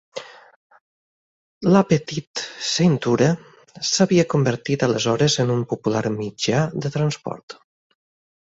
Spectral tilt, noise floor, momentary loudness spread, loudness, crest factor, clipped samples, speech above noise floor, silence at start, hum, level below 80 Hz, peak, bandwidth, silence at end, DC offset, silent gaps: -5 dB/octave; under -90 dBFS; 12 LU; -20 LUFS; 18 dB; under 0.1%; over 70 dB; 0.15 s; none; -56 dBFS; -2 dBFS; 8 kHz; 0.95 s; under 0.1%; 0.56-0.70 s, 0.81-1.61 s, 2.27-2.34 s, 7.43-7.48 s